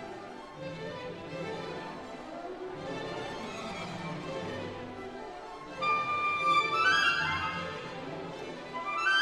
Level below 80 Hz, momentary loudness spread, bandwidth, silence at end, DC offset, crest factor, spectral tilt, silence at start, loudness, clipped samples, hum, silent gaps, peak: -62 dBFS; 17 LU; 13 kHz; 0 s; under 0.1%; 20 dB; -3.5 dB/octave; 0 s; -33 LUFS; under 0.1%; none; none; -14 dBFS